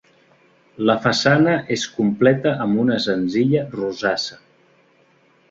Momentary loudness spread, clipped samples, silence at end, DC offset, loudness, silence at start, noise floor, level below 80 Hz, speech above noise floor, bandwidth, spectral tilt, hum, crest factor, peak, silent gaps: 7 LU; under 0.1%; 1.15 s; under 0.1%; -19 LUFS; 0.8 s; -57 dBFS; -58 dBFS; 38 dB; 7.8 kHz; -5.5 dB/octave; none; 18 dB; -2 dBFS; none